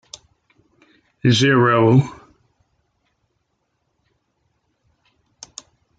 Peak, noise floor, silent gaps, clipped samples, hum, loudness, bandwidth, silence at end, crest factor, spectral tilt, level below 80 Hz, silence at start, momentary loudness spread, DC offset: -4 dBFS; -71 dBFS; none; under 0.1%; none; -16 LUFS; 9.2 kHz; 3.85 s; 20 dB; -6 dB/octave; -60 dBFS; 1.25 s; 26 LU; under 0.1%